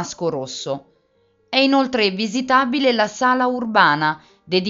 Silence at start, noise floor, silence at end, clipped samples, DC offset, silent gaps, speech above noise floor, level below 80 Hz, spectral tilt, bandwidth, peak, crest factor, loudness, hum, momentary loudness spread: 0 s; -62 dBFS; 0 s; under 0.1%; under 0.1%; none; 43 dB; -62 dBFS; -2 dB/octave; 7.8 kHz; 0 dBFS; 20 dB; -18 LUFS; none; 11 LU